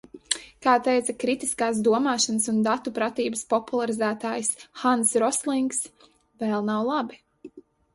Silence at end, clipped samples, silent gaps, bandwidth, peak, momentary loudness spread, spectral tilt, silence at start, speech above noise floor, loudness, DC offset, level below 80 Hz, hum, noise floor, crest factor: 0.35 s; under 0.1%; none; 11.5 kHz; -4 dBFS; 8 LU; -3 dB/octave; 0.15 s; 23 dB; -25 LUFS; under 0.1%; -66 dBFS; none; -47 dBFS; 22 dB